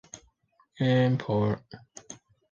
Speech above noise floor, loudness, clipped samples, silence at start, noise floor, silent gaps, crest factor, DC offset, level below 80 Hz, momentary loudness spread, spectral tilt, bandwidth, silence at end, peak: 42 dB; -27 LUFS; under 0.1%; 0.15 s; -67 dBFS; none; 18 dB; under 0.1%; -60 dBFS; 23 LU; -7 dB/octave; 7.6 kHz; 0.4 s; -12 dBFS